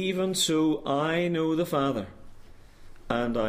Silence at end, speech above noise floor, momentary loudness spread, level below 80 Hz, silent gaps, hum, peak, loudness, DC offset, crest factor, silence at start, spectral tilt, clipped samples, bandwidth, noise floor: 0 s; 21 dB; 7 LU; -50 dBFS; none; none; -12 dBFS; -27 LUFS; under 0.1%; 16 dB; 0 s; -4.5 dB/octave; under 0.1%; 15.5 kHz; -47 dBFS